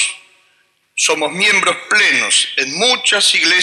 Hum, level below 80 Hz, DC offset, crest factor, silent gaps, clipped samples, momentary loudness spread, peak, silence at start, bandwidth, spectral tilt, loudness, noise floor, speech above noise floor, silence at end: none; -74 dBFS; under 0.1%; 14 dB; none; under 0.1%; 6 LU; 0 dBFS; 0 s; 14 kHz; 0 dB/octave; -12 LUFS; -58 dBFS; 44 dB; 0 s